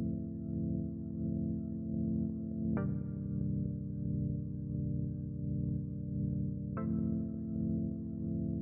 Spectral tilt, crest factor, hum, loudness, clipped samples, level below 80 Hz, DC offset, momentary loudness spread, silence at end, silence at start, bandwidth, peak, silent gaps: -12 dB/octave; 14 dB; none; -37 LUFS; under 0.1%; -50 dBFS; under 0.1%; 4 LU; 0 s; 0 s; 2.5 kHz; -22 dBFS; none